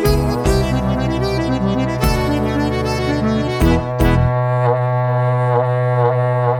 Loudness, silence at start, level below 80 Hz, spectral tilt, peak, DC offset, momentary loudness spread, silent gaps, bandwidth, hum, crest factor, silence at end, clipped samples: -17 LUFS; 0 s; -26 dBFS; -7 dB/octave; 0 dBFS; under 0.1%; 3 LU; none; 18.5 kHz; none; 16 dB; 0 s; under 0.1%